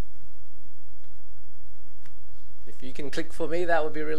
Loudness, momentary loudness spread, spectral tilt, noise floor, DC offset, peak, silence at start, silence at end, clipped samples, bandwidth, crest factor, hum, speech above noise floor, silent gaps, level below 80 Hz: -30 LUFS; 24 LU; -6 dB/octave; -55 dBFS; 10%; -8 dBFS; 0.15 s; 0 s; under 0.1%; 14 kHz; 22 dB; none; 25 dB; none; -54 dBFS